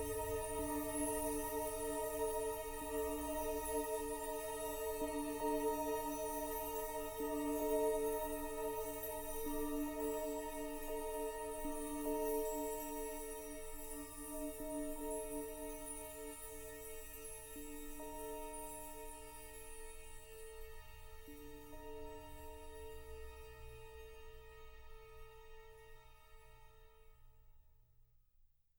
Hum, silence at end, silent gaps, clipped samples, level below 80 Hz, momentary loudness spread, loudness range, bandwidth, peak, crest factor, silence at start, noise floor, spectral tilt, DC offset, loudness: none; 0.15 s; none; under 0.1%; -54 dBFS; 17 LU; 16 LU; over 20 kHz; -26 dBFS; 18 dB; 0 s; -72 dBFS; -4 dB/octave; under 0.1%; -43 LUFS